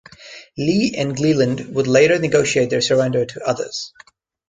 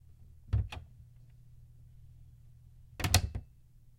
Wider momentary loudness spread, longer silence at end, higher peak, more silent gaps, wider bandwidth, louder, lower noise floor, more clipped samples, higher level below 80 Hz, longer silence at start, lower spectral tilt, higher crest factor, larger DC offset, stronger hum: second, 15 LU vs 28 LU; about the same, 0.6 s vs 0.55 s; first, -2 dBFS vs -6 dBFS; neither; second, 9.6 kHz vs 16 kHz; first, -18 LUFS vs -34 LUFS; second, -41 dBFS vs -58 dBFS; neither; second, -54 dBFS vs -46 dBFS; about the same, 0.2 s vs 0.2 s; first, -5 dB/octave vs -3.5 dB/octave; second, 16 dB vs 32 dB; neither; neither